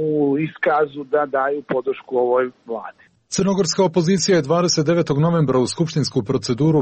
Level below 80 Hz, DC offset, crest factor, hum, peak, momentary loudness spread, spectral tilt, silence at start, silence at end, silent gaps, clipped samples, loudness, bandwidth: -54 dBFS; under 0.1%; 12 dB; none; -6 dBFS; 6 LU; -5.5 dB/octave; 0 s; 0 s; none; under 0.1%; -19 LUFS; 8.8 kHz